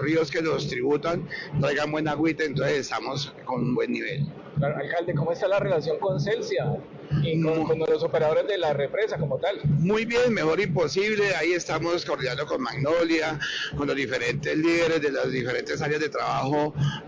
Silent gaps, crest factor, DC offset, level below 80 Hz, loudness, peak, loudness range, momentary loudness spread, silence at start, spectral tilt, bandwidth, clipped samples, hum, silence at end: none; 10 dB; under 0.1%; -54 dBFS; -25 LUFS; -16 dBFS; 3 LU; 6 LU; 0 s; -6 dB/octave; 7.8 kHz; under 0.1%; none; 0 s